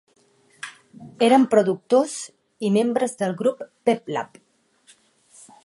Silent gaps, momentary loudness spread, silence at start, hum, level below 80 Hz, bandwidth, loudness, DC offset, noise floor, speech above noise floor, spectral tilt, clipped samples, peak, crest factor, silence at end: none; 21 LU; 0.65 s; none; -74 dBFS; 11.5 kHz; -21 LUFS; under 0.1%; -60 dBFS; 40 dB; -5 dB/octave; under 0.1%; -4 dBFS; 20 dB; 1.4 s